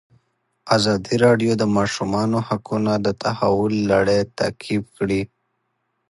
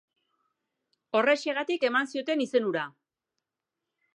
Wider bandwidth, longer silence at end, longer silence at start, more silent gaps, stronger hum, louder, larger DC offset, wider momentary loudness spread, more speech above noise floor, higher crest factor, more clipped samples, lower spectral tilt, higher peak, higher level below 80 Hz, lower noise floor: about the same, 11.5 kHz vs 10.5 kHz; second, 0.85 s vs 1.25 s; second, 0.65 s vs 1.15 s; neither; neither; first, -20 LUFS vs -27 LUFS; neither; about the same, 7 LU vs 7 LU; second, 53 dB vs 60 dB; about the same, 18 dB vs 20 dB; neither; first, -6 dB/octave vs -4 dB/octave; first, -2 dBFS vs -10 dBFS; first, -50 dBFS vs -86 dBFS; second, -72 dBFS vs -87 dBFS